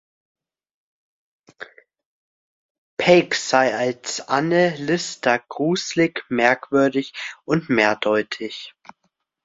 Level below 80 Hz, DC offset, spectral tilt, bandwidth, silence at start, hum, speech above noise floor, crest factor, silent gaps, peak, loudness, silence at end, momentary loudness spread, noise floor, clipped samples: -62 dBFS; under 0.1%; -4.5 dB/octave; 8 kHz; 1.6 s; none; 22 dB; 20 dB; 2.05-2.97 s; -2 dBFS; -20 LUFS; 0.75 s; 17 LU; -42 dBFS; under 0.1%